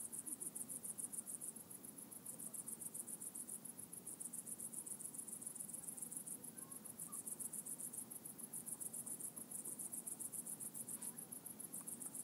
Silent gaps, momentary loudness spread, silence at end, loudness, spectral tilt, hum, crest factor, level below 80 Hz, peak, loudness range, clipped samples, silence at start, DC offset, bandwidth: none; 5 LU; 0 s; -48 LUFS; -2.5 dB/octave; none; 20 dB; under -90 dBFS; -30 dBFS; 2 LU; under 0.1%; 0 s; under 0.1%; 16 kHz